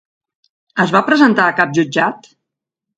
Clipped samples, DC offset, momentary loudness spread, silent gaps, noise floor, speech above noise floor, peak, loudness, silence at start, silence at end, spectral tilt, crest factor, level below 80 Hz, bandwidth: under 0.1%; under 0.1%; 8 LU; none; -81 dBFS; 67 dB; 0 dBFS; -14 LUFS; 0.75 s; 0.8 s; -5.5 dB/octave; 16 dB; -62 dBFS; 9 kHz